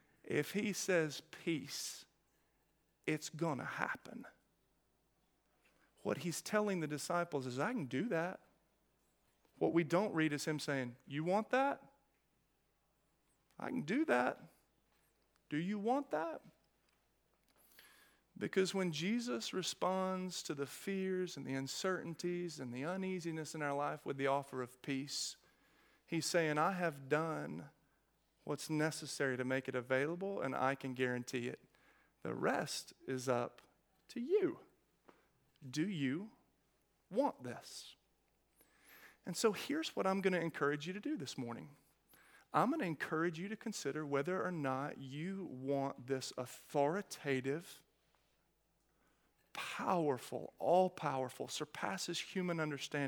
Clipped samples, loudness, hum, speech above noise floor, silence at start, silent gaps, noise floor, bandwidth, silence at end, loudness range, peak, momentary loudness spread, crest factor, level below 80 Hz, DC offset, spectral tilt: under 0.1%; -39 LUFS; none; 40 dB; 0.25 s; none; -79 dBFS; 18.5 kHz; 0 s; 5 LU; -16 dBFS; 11 LU; 24 dB; -84 dBFS; under 0.1%; -4.5 dB/octave